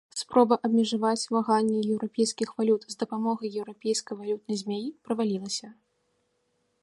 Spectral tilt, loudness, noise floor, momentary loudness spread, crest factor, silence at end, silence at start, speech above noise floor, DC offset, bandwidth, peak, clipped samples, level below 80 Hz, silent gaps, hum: -4.5 dB/octave; -27 LUFS; -74 dBFS; 10 LU; 20 dB; 1.1 s; 0.15 s; 47 dB; under 0.1%; 11.5 kHz; -8 dBFS; under 0.1%; -76 dBFS; none; none